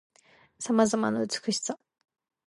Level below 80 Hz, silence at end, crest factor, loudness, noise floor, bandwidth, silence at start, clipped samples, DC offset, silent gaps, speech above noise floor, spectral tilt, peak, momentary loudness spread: -72 dBFS; 0.7 s; 20 dB; -28 LUFS; -61 dBFS; 11.5 kHz; 0.6 s; under 0.1%; under 0.1%; none; 34 dB; -4 dB/octave; -10 dBFS; 14 LU